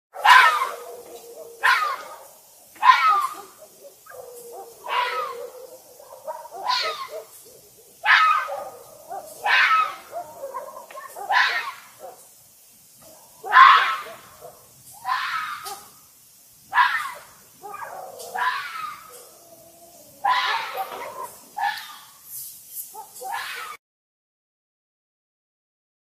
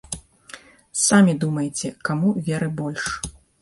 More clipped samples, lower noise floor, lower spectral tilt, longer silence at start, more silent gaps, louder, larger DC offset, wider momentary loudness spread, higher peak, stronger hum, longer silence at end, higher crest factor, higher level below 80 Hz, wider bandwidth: neither; first, -52 dBFS vs -45 dBFS; second, 1 dB/octave vs -4.5 dB/octave; about the same, 0.15 s vs 0.1 s; neither; about the same, -20 LUFS vs -21 LUFS; neither; about the same, 25 LU vs 24 LU; first, 0 dBFS vs -4 dBFS; neither; first, 2.3 s vs 0.3 s; first, 24 dB vs 18 dB; second, -74 dBFS vs -50 dBFS; first, 15.5 kHz vs 11.5 kHz